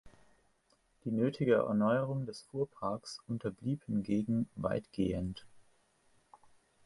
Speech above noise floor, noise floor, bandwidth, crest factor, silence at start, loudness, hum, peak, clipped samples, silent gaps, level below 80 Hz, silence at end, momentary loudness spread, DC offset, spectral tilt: 39 dB; -73 dBFS; 11.5 kHz; 20 dB; 0.05 s; -35 LUFS; none; -16 dBFS; under 0.1%; none; -60 dBFS; 1.25 s; 12 LU; under 0.1%; -7.5 dB/octave